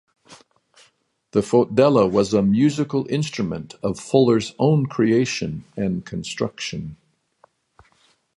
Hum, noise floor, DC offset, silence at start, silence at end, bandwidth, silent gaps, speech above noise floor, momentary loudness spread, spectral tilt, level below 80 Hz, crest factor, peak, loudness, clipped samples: none; -63 dBFS; under 0.1%; 0.3 s; 1.45 s; 11.5 kHz; none; 43 dB; 12 LU; -6.5 dB/octave; -52 dBFS; 18 dB; -2 dBFS; -20 LUFS; under 0.1%